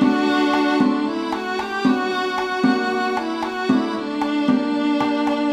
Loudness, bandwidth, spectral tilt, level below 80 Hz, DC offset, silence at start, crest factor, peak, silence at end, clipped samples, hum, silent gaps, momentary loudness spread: -20 LUFS; 11 kHz; -5.5 dB/octave; -58 dBFS; under 0.1%; 0 s; 16 dB; -4 dBFS; 0 s; under 0.1%; none; none; 6 LU